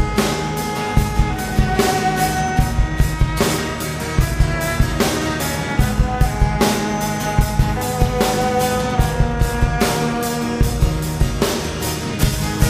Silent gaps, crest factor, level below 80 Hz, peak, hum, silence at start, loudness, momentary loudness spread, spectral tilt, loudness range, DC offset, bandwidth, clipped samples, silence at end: none; 16 dB; -22 dBFS; -2 dBFS; none; 0 s; -19 LUFS; 4 LU; -5 dB/octave; 1 LU; under 0.1%; 15.5 kHz; under 0.1%; 0 s